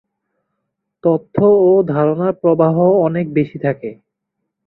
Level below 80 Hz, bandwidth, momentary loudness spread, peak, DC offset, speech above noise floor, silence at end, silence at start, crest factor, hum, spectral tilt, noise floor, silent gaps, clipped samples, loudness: -58 dBFS; 4.1 kHz; 9 LU; -2 dBFS; under 0.1%; 62 dB; 0.75 s; 1.05 s; 14 dB; none; -13 dB/octave; -76 dBFS; none; under 0.1%; -15 LUFS